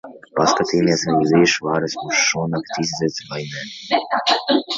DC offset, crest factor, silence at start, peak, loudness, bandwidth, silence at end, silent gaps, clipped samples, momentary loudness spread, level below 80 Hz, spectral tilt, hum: under 0.1%; 18 dB; 0.05 s; -2 dBFS; -19 LUFS; 7.8 kHz; 0 s; none; under 0.1%; 12 LU; -56 dBFS; -3.5 dB/octave; none